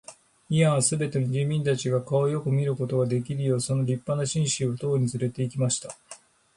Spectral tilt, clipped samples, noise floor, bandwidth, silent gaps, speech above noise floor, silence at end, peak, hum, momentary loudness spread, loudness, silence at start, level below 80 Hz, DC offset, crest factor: -5.5 dB/octave; under 0.1%; -50 dBFS; 11.5 kHz; none; 25 dB; 0.4 s; -10 dBFS; none; 5 LU; -26 LUFS; 0.1 s; -62 dBFS; under 0.1%; 16 dB